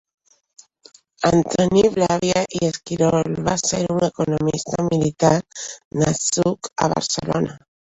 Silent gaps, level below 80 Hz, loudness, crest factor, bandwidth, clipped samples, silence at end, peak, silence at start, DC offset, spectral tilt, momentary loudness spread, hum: 5.85-5.91 s; -50 dBFS; -20 LUFS; 18 dB; 8.4 kHz; under 0.1%; 0.35 s; -2 dBFS; 1.2 s; under 0.1%; -5 dB/octave; 6 LU; none